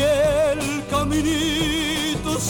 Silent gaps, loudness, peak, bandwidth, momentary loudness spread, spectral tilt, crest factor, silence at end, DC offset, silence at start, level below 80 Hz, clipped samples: none; -21 LUFS; -10 dBFS; 17.5 kHz; 5 LU; -4 dB/octave; 10 dB; 0 s; under 0.1%; 0 s; -36 dBFS; under 0.1%